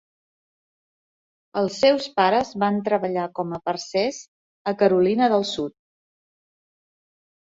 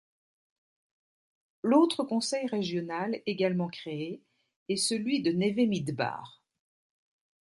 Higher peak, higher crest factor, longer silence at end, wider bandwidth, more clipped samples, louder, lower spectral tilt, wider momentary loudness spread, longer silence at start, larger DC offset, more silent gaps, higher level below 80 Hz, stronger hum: first, -4 dBFS vs -12 dBFS; about the same, 20 dB vs 20 dB; first, 1.8 s vs 1.1 s; second, 7.8 kHz vs 11.5 kHz; neither; first, -22 LUFS vs -29 LUFS; about the same, -5 dB/octave vs -5 dB/octave; about the same, 11 LU vs 12 LU; about the same, 1.55 s vs 1.65 s; neither; first, 4.28-4.65 s vs 4.56-4.66 s; first, -64 dBFS vs -76 dBFS; neither